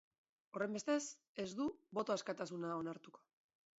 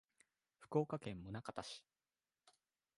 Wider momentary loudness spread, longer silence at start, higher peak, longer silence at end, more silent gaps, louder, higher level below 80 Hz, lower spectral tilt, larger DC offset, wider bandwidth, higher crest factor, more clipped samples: second, 9 LU vs 12 LU; about the same, 0.55 s vs 0.6 s; second, -26 dBFS vs -22 dBFS; first, 0.6 s vs 0.45 s; first, 1.27-1.35 s vs none; about the same, -43 LUFS vs -45 LUFS; second, -82 dBFS vs -74 dBFS; second, -4.5 dB/octave vs -6.5 dB/octave; neither; second, 8 kHz vs 11.5 kHz; second, 18 dB vs 26 dB; neither